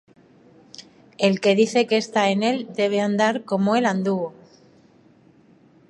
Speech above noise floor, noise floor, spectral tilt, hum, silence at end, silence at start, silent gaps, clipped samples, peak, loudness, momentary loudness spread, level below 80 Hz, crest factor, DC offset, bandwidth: 34 dB; -54 dBFS; -5 dB/octave; none; 1.6 s; 0.8 s; none; under 0.1%; -4 dBFS; -21 LUFS; 11 LU; -72 dBFS; 18 dB; under 0.1%; 11.5 kHz